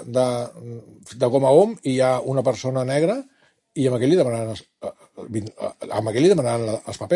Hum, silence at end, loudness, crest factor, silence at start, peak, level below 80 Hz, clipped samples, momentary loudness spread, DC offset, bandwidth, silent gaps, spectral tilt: none; 0 s; -21 LUFS; 20 dB; 0 s; -2 dBFS; -64 dBFS; under 0.1%; 19 LU; under 0.1%; 11.5 kHz; none; -6.5 dB/octave